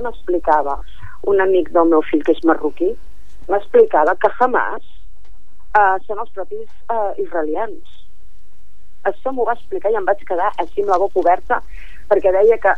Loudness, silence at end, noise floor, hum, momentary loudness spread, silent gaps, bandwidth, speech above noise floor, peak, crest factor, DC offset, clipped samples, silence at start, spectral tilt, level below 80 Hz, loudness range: -17 LUFS; 0 s; -52 dBFS; none; 13 LU; none; 7 kHz; 35 dB; -2 dBFS; 16 dB; 9%; under 0.1%; 0 s; -7 dB/octave; -44 dBFS; 7 LU